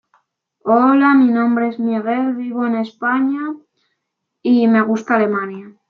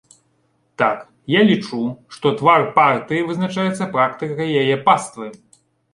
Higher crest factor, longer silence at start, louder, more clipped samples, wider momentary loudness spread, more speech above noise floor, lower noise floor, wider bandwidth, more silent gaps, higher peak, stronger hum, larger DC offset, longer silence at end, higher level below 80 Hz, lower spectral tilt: about the same, 14 dB vs 18 dB; second, 0.65 s vs 0.8 s; about the same, -16 LUFS vs -18 LUFS; neither; about the same, 13 LU vs 11 LU; first, 60 dB vs 46 dB; first, -76 dBFS vs -64 dBFS; second, 6.8 kHz vs 11.5 kHz; neither; about the same, -2 dBFS vs -2 dBFS; neither; neither; second, 0.2 s vs 0.6 s; second, -70 dBFS vs -62 dBFS; first, -7.5 dB/octave vs -5.5 dB/octave